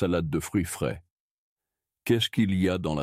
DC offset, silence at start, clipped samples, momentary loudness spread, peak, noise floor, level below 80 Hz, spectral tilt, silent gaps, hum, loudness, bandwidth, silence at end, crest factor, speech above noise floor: under 0.1%; 0 s; under 0.1%; 9 LU; -12 dBFS; -89 dBFS; -52 dBFS; -5.5 dB/octave; 1.10-1.56 s; none; -27 LUFS; 16 kHz; 0 s; 16 dB; 63 dB